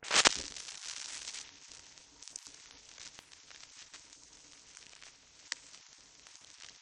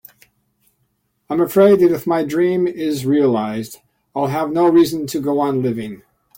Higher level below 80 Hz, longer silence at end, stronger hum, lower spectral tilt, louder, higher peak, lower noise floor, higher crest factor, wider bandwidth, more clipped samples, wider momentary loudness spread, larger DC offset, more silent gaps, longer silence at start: second, -70 dBFS vs -58 dBFS; second, 0.05 s vs 0.4 s; neither; second, 1 dB/octave vs -6.5 dB/octave; second, -35 LUFS vs -17 LUFS; about the same, -2 dBFS vs -2 dBFS; second, -59 dBFS vs -67 dBFS; first, 38 dB vs 14 dB; second, 11.5 kHz vs 17 kHz; neither; about the same, 15 LU vs 13 LU; neither; neither; second, 0 s vs 1.3 s